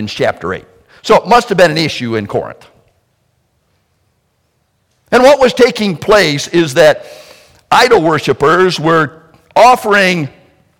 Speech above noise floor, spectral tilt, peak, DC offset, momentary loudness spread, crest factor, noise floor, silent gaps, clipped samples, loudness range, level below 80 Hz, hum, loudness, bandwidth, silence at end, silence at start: 51 dB; -4.5 dB/octave; 0 dBFS; under 0.1%; 12 LU; 12 dB; -61 dBFS; none; 0.2%; 7 LU; -44 dBFS; none; -10 LUFS; 18 kHz; 0.5 s; 0 s